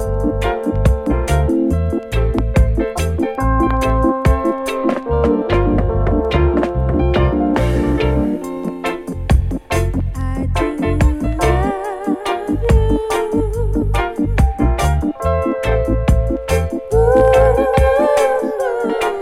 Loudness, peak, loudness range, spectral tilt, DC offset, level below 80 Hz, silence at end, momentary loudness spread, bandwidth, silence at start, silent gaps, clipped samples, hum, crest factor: -17 LUFS; 0 dBFS; 4 LU; -7 dB/octave; under 0.1%; -20 dBFS; 0 s; 6 LU; 14.5 kHz; 0 s; none; under 0.1%; none; 14 dB